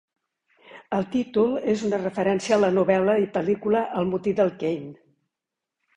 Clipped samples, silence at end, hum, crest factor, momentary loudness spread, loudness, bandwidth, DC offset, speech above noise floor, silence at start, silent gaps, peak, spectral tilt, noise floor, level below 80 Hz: under 0.1%; 1 s; none; 18 dB; 8 LU; -23 LUFS; 10 kHz; under 0.1%; 63 dB; 0.7 s; none; -6 dBFS; -6.5 dB/octave; -86 dBFS; -62 dBFS